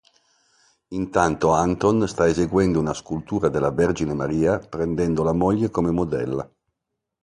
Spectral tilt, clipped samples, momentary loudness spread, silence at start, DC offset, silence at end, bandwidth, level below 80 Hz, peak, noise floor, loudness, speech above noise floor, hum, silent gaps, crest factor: -7 dB/octave; under 0.1%; 8 LU; 0.9 s; under 0.1%; 0.75 s; 11.5 kHz; -42 dBFS; -2 dBFS; -81 dBFS; -22 LUFS; 60 dB; none; none; 20 dB